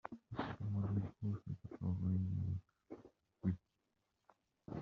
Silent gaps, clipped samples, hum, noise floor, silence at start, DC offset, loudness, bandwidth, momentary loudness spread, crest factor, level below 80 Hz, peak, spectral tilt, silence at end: none; under 0.1%; none; -85 dBFS; 0.05 s; under 0.1%; -43 LUFS; 4.8 kHz; 19 LU; 18 dB; -68 dBFS; -26 dBFS; -9 dB/octave; 0 s